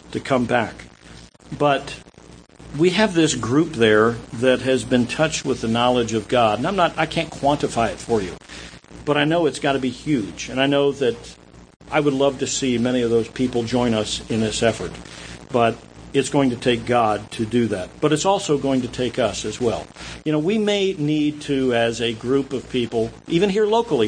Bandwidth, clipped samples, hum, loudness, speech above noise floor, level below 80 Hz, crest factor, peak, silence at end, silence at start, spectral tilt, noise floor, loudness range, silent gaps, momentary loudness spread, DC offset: 9.8 kHz; under 0.1%; none; -20 LUFS; 25 dB; -46 dBFS; 18 dB; -2 dBFS; 0 s; 0.05 s; -5 dB/octave; -45 dBFS; 3 LU; 11.76-11.80 s; 10 LU; under 0.1%